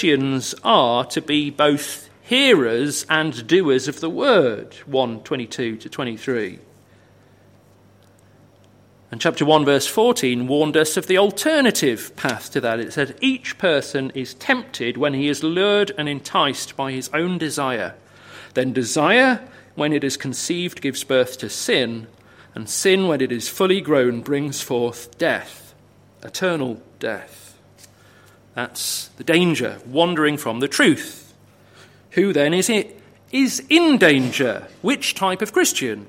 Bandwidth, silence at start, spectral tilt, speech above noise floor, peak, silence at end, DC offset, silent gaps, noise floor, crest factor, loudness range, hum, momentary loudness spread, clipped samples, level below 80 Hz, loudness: 16.5 kHz; 0 s; -4 dB/octave; 32 dB; 0 dBFS; 0.05 s; under 0.1%; none; -52 dBFS; 20 dB; 9 LU; none; 11 LU; under 0.1%; -64 dBFS; -19 LUFS